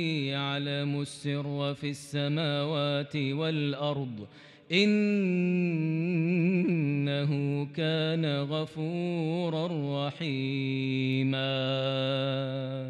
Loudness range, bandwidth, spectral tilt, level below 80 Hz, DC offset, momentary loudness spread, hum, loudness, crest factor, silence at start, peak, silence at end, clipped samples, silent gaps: 3 LU; 11.5 kHz; -7 dB/octave; -78 dBFS; under 0.1%; 6 LU; none; -29 LUFS; 18 dB; 0 s; -10 dBFS; 0 s; under 0.1%; none